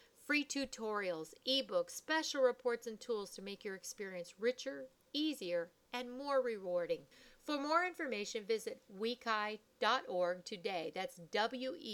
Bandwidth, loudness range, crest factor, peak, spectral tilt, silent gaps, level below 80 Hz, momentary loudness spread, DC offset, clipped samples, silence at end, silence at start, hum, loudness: 18 kHz; 3 LU; 20 dB; -18 dBFS; -2.5 dB/octave; none; -78 dBFS; 11 LU; under 0.1%; under 0.1%; 0 s; 0.2 s; none; -39 LUFS